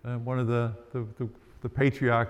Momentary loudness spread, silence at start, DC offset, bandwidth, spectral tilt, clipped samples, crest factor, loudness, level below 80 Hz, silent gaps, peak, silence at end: 13 LU; 0.05 s; under 0.1%; 8 kHz; -8.5 dB/octave; under 0.1%; 16 dB; -30 LUFS; -56 dBFS; none; -12 dBFS; 0 s